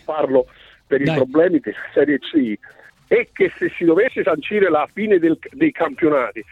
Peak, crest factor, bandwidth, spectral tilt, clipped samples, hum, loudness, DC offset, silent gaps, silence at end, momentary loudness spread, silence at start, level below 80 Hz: -4 dBFS; 14 dB; 5.2 kHz; -8 dB/octave; under 0.1%; none; -18 LUFS; under 0.1%; none; 0.1 s; 5 LU; 0.1 s; -58 dBFS